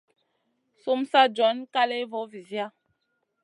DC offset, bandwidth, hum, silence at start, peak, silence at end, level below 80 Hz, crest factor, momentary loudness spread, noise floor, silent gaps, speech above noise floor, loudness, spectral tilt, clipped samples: under 0.1%; 11 kHz; none; 0.85 s; -6 dBFS; 0.75 s; -86 dBFS; 22 dB; 15 LU; -76 dBFS; none; 52 dB; -25 LUFS; -4 dB/octave; under 0.1%